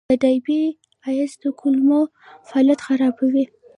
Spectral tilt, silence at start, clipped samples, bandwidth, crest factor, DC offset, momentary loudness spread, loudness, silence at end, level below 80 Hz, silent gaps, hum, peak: -5.5 dB/octave; 0.1 s; under 0.1%; 10.5 kHz; 14 dB; under 0.1%; 8 LU; -20 LUFS; 0.3 s; -62 dBFS; none; none; -6 dBFS